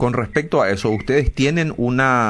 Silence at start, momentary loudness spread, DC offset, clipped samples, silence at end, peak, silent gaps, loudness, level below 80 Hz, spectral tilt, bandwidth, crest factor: 0 s; 3 LU; under 0.1%; under 0.1%; 0 s; -4 dBFS; none; -18 LUFS; -32 dBFS; -6.5 dB/octave; 11 kHz; 14 dB